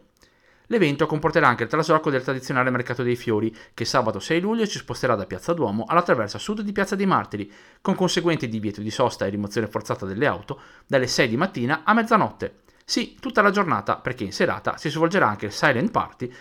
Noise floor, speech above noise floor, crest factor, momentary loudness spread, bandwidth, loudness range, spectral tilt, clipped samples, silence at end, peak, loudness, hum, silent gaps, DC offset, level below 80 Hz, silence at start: -58 dBFS; 35 dB; 20 dB; 9 LU; 17 kHz; 3 LU; -5 dB/octave; under 0.1%; 0 s; -4 dBFS; -23 LUFS; none; none; under 0.1%; -56 dBFS; 0.7 s